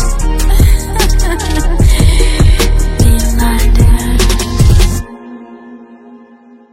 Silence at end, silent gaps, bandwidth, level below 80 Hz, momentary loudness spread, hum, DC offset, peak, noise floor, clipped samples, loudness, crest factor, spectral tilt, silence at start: 0.55 s; none; 16 kHz; -10 dBFS; 9 LU; none; under 0.1%; 0 dBFS; -39 dBFS; 0.5%; -11 LUFS; 10 dB; -5 dB/octave; 0 s